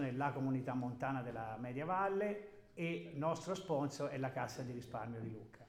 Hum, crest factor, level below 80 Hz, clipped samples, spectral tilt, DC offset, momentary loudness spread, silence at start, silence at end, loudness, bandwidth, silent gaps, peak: none; 18 dB; -72 dBFS; under 0.1%; -6.5 dB/octave; under 0.1%; 8 LU; 0 s; 0 s; -41 LUFS; 15.5 kHz; none; -24 dBFS